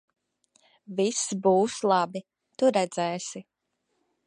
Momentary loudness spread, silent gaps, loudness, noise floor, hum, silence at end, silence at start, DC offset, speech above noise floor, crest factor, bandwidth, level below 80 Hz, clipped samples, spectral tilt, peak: 13 LU; none; -26 LUFS; -77 dBFS; none; 0.85 s; 0.9 s; under 0.1%; 52 dB; 20 dB; 11 kHz; -74 dBFS; under 0.1%; -4 dB/octave; -8 dBFS